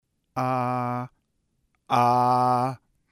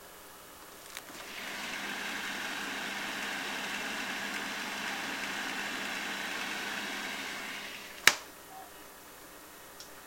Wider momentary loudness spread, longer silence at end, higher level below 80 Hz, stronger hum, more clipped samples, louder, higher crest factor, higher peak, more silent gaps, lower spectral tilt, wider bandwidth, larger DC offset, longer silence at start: about the same, 15 LU vs 14 LU; first, 0.35 s vs 0 s; about the same, -68 dBFS vs -68 dBFS; second, none vs 60 Hz at -65 dBFS; neither; first, -24 LUFS vs -34 LUFS; second, 18 dB vs 36 dB; second, -8 dBFS vs -2 dBFS; neither; first, -7 dB/octave vs -0.5 dB/octave; about the same, 16 kHz vs 16.5 kHz; neither; first, 0.35 s vs 0 s